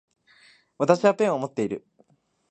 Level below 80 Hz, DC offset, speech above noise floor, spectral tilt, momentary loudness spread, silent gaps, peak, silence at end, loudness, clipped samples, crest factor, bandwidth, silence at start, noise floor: -70 dBFS; under 0.1%; 41 dB; -6 dB/octave; 10 LU; none; -2 dBFS; 0.75 s; -23 LUFS; under 0.1%; 24 dB; 9 kHz; 0.8 s; -63 dBFS